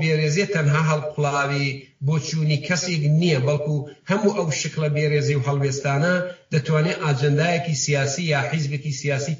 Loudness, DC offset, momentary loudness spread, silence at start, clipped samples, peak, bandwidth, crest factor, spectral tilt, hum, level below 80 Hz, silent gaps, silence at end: -22 LUFS; under 0.1%; 5 LU; 0 s; under 0.1%; -6 dBFS; 7.6 kHz; 14 dB; -5.5 dB/octave; none; -60 dBFS; none; 0 s